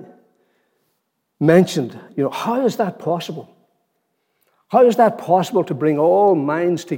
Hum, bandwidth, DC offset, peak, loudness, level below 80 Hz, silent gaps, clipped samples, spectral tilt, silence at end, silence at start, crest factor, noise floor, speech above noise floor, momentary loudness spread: none; 17 kHz; under 0.1%; -2 dBFS; -17 LUFS; -68 dBFS; none; under 0.1%; -6.5 dB/octave; 0 s; 0 s; 18 dB; -72 dBFS; 55 dB; 10 LU